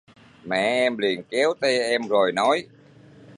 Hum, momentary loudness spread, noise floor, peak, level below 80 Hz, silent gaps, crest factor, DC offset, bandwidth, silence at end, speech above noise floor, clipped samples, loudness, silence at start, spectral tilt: none; 5 LU; -49 dBFS; -6 dBFS; -70 dBFS; none; 16 dB; under 0.1%; 11.5 kHz; 0 s; 27 dB; under 0.1%; -22 LUFS; 0.45 s; -3.5 dB/octave